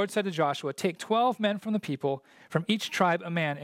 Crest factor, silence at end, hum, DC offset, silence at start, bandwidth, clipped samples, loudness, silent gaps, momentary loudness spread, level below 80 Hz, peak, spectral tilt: 20 dB; 0 s; none; under 0.1%; 0 s; 16.5 kHz; under 0.1%; -29 LUFS; none; 6 LU; -78 dBFS; -10 dBFS; -5 dB/octave